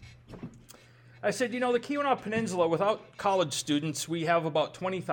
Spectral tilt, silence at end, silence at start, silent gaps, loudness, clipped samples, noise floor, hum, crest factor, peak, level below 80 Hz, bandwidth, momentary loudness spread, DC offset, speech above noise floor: -4.5 dB/octave; 0 s; 0 s; none; -29 LUFS; under 0.1%; -55 dBFS; none; 18 dB; -12 dBFS; -66 dBFS; 19 kHz; 15 LU; under 0.1%; 26 dB